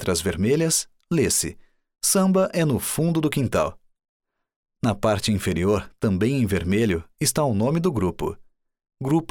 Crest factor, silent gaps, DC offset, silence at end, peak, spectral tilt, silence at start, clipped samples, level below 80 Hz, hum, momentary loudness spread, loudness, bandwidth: 14 dB; 4.09-4.20 s, 4.56-4.63 s; under 0.1%; 0.05 s; -8 dBFS; -5 dB/octave; 0 s; under 0.1%; -46 dBFS; none; 6 LU; -23 LUFS; 20 kHz